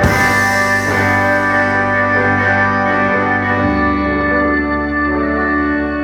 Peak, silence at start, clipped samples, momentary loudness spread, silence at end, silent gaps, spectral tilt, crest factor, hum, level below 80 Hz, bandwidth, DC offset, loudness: 0 dBFS; 0 s; under 0.1%; 3 LU; 0 s; none; -5.5 dB/octave; 14 dB; none; -32 dBFS; 17.5 kHz; under 0.1%; -13 LUFS